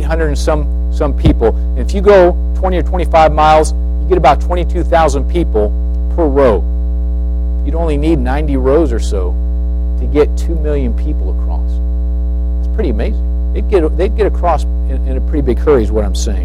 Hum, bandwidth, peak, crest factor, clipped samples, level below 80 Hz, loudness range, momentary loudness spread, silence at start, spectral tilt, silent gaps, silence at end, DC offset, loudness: 60 Hz at -15 dBFS; 10 kHz; 0 dBFS; 12 dB; under 0.1%; -14 dBFS; 5 LU; 8 LU; 0 s; -7 dB/octave; none; 0 s; under 0.1%; -13 LUFS